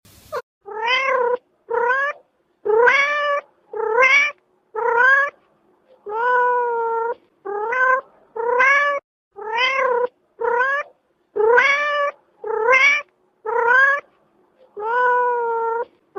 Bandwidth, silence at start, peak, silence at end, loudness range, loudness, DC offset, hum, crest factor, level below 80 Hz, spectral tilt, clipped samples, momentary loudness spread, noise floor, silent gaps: 7 kHz; 0.3 s; -2 dBFS; 0.35 s; 3 LU; -18 LUFS; under 0.1%; none; 18 dB; -70 dBFS; -1 dB/octave; under 0.1%; 17 LU; -59 dBFS; 0.43-0.61 s, 9.04-9.31 s